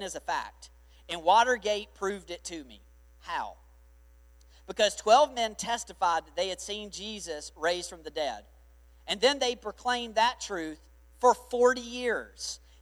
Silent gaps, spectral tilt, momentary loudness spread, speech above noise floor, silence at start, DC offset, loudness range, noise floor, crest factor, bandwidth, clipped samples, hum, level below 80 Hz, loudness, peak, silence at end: none; -2 dB/octave; 16 LU; 27 dB; 0 s; under 0.1%; 5 LU; -57 dBFS; 20 dB; 15 kHz; under 0.1%; 60 Hz at -55 dBFS; -56 dBFS; -29 LUFS; -10 dBFS; 0.25 s